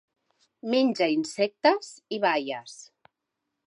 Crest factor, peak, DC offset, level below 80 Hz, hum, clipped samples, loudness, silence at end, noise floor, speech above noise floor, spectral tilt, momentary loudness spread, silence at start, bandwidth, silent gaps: 18 dB; -10 dBFS; under 0.1%; -84 dBFS; none; under 0.1%; -26 LUFS; 0.8 s; -83 dBFS; 57 dB; -4 dB/octave; 15 LU; 0.65 s; 11.5 kHz; none